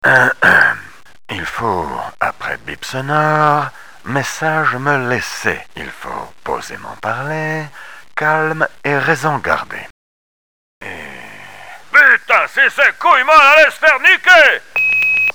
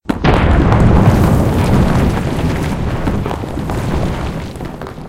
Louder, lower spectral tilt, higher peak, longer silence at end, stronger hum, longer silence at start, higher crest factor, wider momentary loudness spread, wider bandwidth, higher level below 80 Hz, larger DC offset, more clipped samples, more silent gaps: about the same, -12 LUFS vs -14 LUFS; second, -4 dB/octave vs -7.5 dB/octave; about the same, 0 dBFS vs 0 dBFS; about the same, 0.05 s vs 0 s; neither; about the same, 0.05 s vs 0.1 s; about the same, 14 dB vs 14 dB; first, 21 LU vs 12 LU; first, over 20 kHz vs 16.5 kHz; second, -50 dBFS vs -20 dBFS; first, 1% vs under 0.1%; neither; first, 9.90-10.81 s vs none